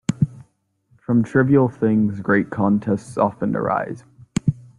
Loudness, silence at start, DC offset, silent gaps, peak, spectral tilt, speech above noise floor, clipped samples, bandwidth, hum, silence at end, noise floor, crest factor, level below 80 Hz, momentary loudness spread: -20 LUFS; 0.1 s; under 0.1%; none; -4 dBFS; -8 dB/octave; 43 dB; under 0.1%; 11 kHz; none; 0.25 s; -62 dBFS; 16 dB; -54 dBFS; 8 LU